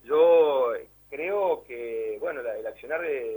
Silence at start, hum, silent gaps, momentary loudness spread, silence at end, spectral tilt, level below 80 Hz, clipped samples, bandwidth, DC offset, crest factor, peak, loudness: 0.05 s; none; none; 15 LU; 0 s; -5.5 dB/octave; -66 dBFS; under 0.1%; over 20 kHz; under 0.1%; 16 dB; -10 dBFS; -26 LUFS